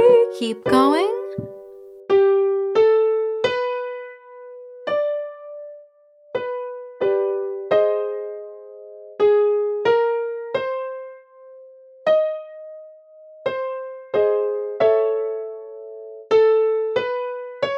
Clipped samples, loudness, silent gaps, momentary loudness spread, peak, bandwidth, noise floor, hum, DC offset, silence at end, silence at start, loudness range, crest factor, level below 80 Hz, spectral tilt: under 0.1%; -21 LUFS; none; 22 LU; -4 dBFS; 11 kHz; -52 dBFS; none; under 0.1%; 0 s; 0 s; 7 LU; 18 dB; -66 dBFS; -5.5 dB/octave